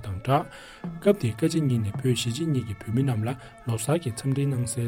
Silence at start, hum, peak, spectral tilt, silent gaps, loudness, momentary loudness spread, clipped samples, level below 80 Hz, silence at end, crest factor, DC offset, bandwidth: 0 s; none; -8 dBFS; -6 dB/octave; none; -26 LUFS; 8 LU; under 0.1%; -54 dBFS; 0 s; 18 dB; under 0.1%; 16.5 kHz